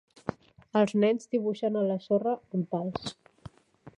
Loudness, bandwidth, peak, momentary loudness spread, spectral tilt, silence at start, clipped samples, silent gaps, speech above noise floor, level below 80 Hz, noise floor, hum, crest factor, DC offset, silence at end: -29 LUFS; 10 kHz; -10 dBFS; 14 LU; -7 dB/octave; 0.25 s; under 0.1%; none; 27 dB; -64 dBFS; -55 dBFS; none; 20 dB; under 0.1%; 0.1 s